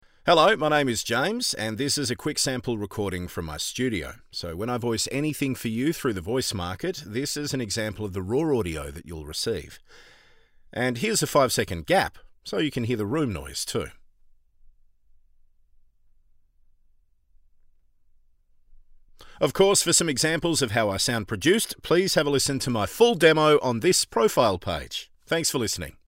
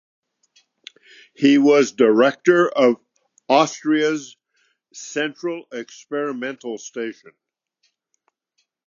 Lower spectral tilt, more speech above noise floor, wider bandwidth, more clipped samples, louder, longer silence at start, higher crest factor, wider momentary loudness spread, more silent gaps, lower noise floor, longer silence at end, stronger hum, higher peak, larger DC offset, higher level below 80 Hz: about the same, -3.5 dB/octave vs -4.5 dB/octave; second, 36 dB vs 53 dB; first, 16 kHz vs 7.4 kHz; neither; second, -24 LUFS vs -19 LUFS; second, 0.25 s vs 1.4 s; about the same, 20 dB vs 20 dB; second, 12 LU vs 16 LU; neither; second, -61 dBFS vs -72 dBFS; second, 0.15 s vs 1.75 s; neither; second, -6 dBFS vs -2 dBFS; neither; first, -52 dBFS vs -80 dBFS